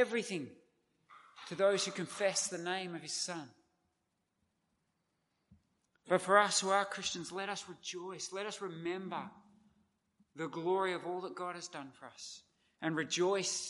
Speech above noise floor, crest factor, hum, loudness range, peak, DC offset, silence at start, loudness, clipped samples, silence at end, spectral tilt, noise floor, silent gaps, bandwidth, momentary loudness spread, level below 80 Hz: 47 dB; 26 dB; none; 9 LU; -12 dBFS; under 0.1%; 0 s; -36 LUFS; under 0.1%; 0 s; -2.5 dB/octave; -83 dBFS; none; 11.5 kHz; 17 LU; -84 dBFS